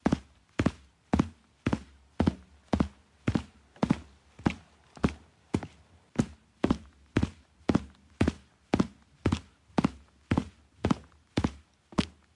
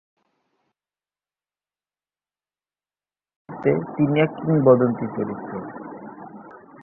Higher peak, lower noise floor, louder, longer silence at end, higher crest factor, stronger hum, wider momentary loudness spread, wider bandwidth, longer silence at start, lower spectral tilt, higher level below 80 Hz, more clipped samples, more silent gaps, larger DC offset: second, -10 dBFS vs -2 dBFS; second, -56 dBFS vs under -90 dBFS; second, -33 LUFS vs -21 LUFS; first, 0.25 s vs 0 s; about the same, 22 dB vs 22 dB; second, none vs 50 Hz at -55 dBFS; second, 6 LU vs 23 LU; first, 11.5 kHz vs 3.4 kHz; second, 0.05 s vs 3.5 s; second, -7 dB/octave vs -11.5 dB/octave; first, -46 dBFS vs -62 dBFS; neither; neither; neither